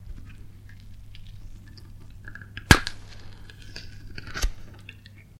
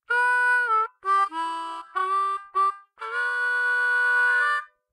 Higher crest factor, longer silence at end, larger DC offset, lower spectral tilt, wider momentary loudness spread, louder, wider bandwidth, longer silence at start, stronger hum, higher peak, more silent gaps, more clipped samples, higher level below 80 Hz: first, 30 dB vs 12 dB; second, 0 s vs 0.25 s; neither; first, -3.5 dB/octave vs 1 dB/octave; first, 29 LU vs 10 LU; about the same, -23 LUFS vs -23 LUFS; first, 16 kHz vs 11 kHz; about the same, 0 s vs 0.1 s; neither; first, 0 dBFS vs -12 dBFS; neither; neither; first, -36 dBFS vs -84 dBFS